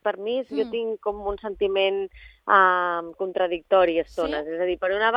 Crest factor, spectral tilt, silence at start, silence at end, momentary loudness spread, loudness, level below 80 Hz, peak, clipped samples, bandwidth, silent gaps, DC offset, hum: 20 dB; -5.5 dB/octave; 0.05 s; 0 s; 11 LU; -24 LUFS; -52 dBFS; -4 dBFS; under 0.1%; 7.6 kHz; none; under 0.1%; none